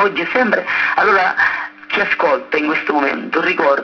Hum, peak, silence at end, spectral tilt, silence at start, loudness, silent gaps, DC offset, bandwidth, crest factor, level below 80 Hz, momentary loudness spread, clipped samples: none; 0 dBFS; 0 s; -5 dB/octave; 0 s; -15 LUFS; none; under 0.1%; 5.4 kHz; 16 dB; -56 dBFS; 5 LU; under 0.1%